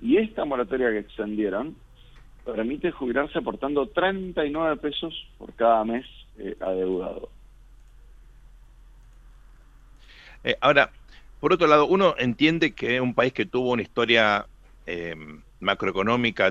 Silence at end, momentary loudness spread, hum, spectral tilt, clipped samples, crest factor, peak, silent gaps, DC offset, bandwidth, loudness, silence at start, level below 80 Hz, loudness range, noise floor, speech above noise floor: 0 s; 16 LU; none; -6 dB/octave; under 0.1%; 24 dB; -2 dBFS; none; under 0.1%; 7.6 kHz; -24 LUFS; 0 s; -50 dBFS; 12 LU; -50 dBFS; 26 dB